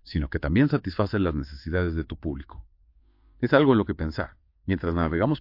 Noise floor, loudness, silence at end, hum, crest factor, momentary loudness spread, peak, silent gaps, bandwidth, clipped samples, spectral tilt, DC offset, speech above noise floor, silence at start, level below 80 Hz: -59 dBFS; -25 LUFS; 0 s; none; 20 dB; 14 LU; -6 dBFS; none; 5.8 kHz; under 0.1%; -9.5 dB/octave; under 0.1%; 35 dB; 0.05 s; -42 dBFS